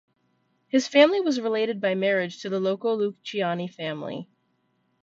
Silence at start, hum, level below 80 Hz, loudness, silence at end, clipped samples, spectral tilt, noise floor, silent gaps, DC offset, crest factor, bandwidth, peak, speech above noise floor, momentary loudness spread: 0.75 s; none; -74 dBFS; -24 LUFS; 0.8 s; under 0.1%; -5 dB/octave; -71 dBFS; none; under 0.1%; 20 dB; 7.8 kHz; -6 dBFS; 47 dB; 13 LU